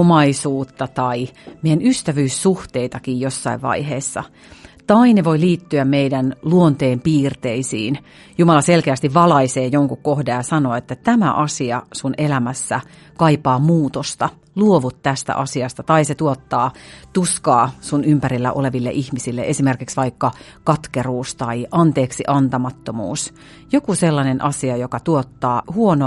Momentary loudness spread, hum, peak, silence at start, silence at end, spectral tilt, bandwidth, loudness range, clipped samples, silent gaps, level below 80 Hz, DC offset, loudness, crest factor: 9 LU; none; 0 dBFS; 0 s; 0 s; -6 dB/octave; 11.5 kHz; 4 LU; under 0.1%; none; -50 dBFS; under 0.1%; -18 LUFS; 16 dB